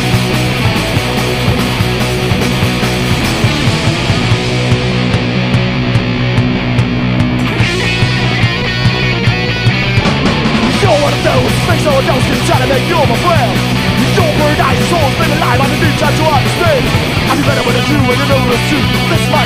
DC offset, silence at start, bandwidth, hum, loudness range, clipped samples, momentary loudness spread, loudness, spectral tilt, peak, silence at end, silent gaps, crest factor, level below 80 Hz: under 0.1%; 0 s; 15.5 kHz; none; 2 LU; under 0.1%; 3 LU; -11 LUFS; -5.5 dB/octave; 0 dBFS; 0 s; none; 10 dB; -26 dBFS